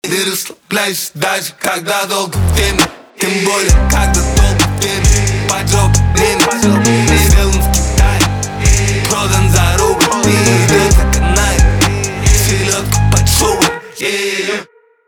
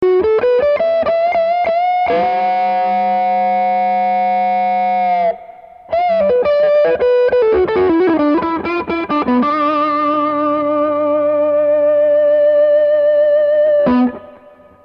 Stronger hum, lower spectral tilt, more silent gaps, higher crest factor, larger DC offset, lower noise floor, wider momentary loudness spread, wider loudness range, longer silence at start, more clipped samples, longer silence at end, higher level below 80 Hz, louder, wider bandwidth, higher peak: neither; second, -4 dB/octave vs -8 dB/octave; neither; about the same, 12 dB vs 10 dB; neither; second, -32 dBFS vs -42 dBFS; about the same, 6 LU vs 4 LU; about the same, 3 LU vs 3 LU; about the same, 0.05 s vs 0 s; neither; about the same, 0.45 s vs 0.5 s; first, -16 dBFS vs -48 dBFS; about the same, -12 LUFS vs -14 LUFS; first, over 20 kHz vs 5.6 kHz; about the same, 0 dBFS vs -2 dBFS